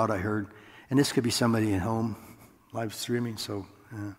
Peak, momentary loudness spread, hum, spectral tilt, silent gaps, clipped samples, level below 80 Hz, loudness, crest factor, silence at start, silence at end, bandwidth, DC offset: -10 dBFS; 15 LU; none; -5 dB/octave; none; under 0.1%; -64 dBFS; -29 LUFS; 20 dB; 0 s; 0.05 s; 16 kHz; under 0.1%